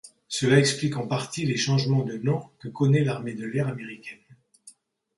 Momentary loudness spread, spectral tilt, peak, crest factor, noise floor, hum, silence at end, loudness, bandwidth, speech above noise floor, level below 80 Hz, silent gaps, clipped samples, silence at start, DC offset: 16 LU; -5.5 dB/octave; -4 dBFS; 22 dB; -55 dBFS; none; 0.45 s; -25 LUFS; 11.5 kHz; 30 dB; -64 dBFS; none; under 0.1%; 0.05 s; under 0.1%